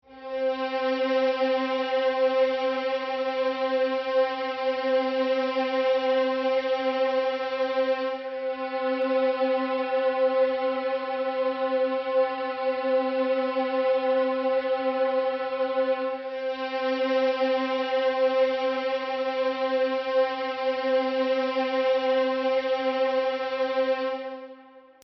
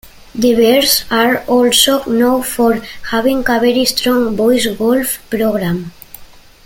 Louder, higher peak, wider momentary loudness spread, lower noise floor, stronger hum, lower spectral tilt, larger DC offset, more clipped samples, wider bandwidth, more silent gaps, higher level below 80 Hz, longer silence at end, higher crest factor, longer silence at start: second, -26 LUFS vs -13 LUFS; second, -14 dBFS vs 0 dBFS; second, 5 LU vs 9 LU; first, -50 dBFS vs -38 dBFS; neither; second, 0.5 dB/octave vs -3 dB/octave; neither; neither; second, 6 kHz vs 17 kHz; neither; second, -72 dBFS vs -42 dBFS; second, 0.25 s vs 0.4 s; about the same, 12 dB vs 14 dB; second, 0.1 s vs 0.35 s